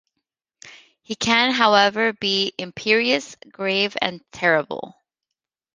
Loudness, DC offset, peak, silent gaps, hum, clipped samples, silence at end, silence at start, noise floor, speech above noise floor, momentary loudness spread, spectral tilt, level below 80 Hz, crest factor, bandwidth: -19 LUFS; under 0.1%; 0 dBFS; none; none; under 0.1%; 0.9 s; 0.65 s; -84 dBFS; 63 dB; 16 LU; -3 dB/octave; -62 dBFS; 22 dB; 10 kHz